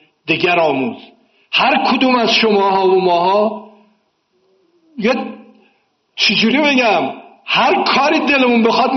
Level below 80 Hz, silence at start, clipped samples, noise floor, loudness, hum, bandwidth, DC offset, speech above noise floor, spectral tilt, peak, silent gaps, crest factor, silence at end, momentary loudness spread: -60 dBFS; 0.25 s; under 0.1%; -62 dBFS; -13 LUFS; none; 6.4 kHz; under 0.1%; 49 dB; -1.5 dB/octave; -2 dBFS; none; 14 dB; 0 s; 10 LU